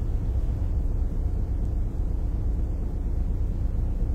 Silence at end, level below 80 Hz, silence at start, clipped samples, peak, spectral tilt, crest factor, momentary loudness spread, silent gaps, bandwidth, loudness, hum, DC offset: 0 s; -26 dBFS; 0 s; under 0.1%; -16 dBFS; -9.5 dB/octave; 10 dB; 2 LU; none; 2.6 kHz; -30 LUFS; none; under 0.1%